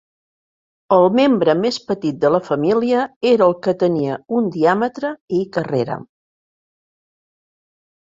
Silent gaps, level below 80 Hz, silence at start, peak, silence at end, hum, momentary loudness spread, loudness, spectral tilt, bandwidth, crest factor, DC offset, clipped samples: 3.16-3.21 s, 5.21-5.28 s; -62 dBFS; 0.9 s; -2 dBFS; 1.95 s; none; 8 LU; -17 LUFS; -7 dB/octave; 7.8 kHz; 18 dB; under 0.1%; under 0.1%